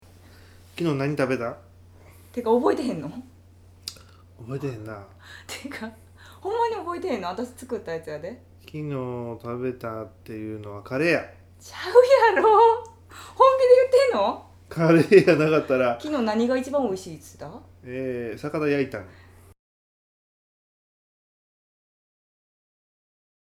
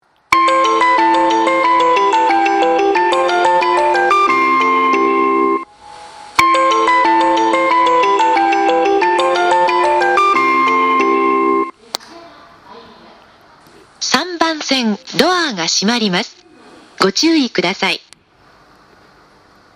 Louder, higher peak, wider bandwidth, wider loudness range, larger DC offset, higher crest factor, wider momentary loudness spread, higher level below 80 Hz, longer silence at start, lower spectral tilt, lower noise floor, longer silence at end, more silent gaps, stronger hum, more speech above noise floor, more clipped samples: second, -22 LUFS vs -13 LUFS; about the same, -2 dBFS vs 0 dBFS; about the same, 14.5 kHz vs 15.5 kHz; first, 14 LU vs 6 LU; neither; first, 22 dB vs 14 dB; first, 23 LU vs 5 LU; about the same, -60 dBFS vs -56 dBFS; first, 0.75 s vs 0.3 s; first, -6.5 dB/octave vs -3 dB/octave; about the same, -51 dBFS vs -49 dBFS; first, 4.45 s vs 1.8 s; neither; neither; second, 28 dB vs 34 dB; neither